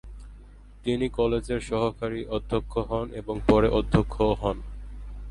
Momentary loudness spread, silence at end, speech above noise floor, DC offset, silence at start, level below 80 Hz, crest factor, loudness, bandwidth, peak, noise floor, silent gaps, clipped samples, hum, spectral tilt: 20 LU; 0 s; 22 dB; under 0.1%; 0.05 s; -36 dBFS; 20 dB; -26 LUFS; 11 kHz; -6 dBFS; -47 dBFS; none; under 0.1%; 50 Hz at -40 dBFS; -7 dB/octave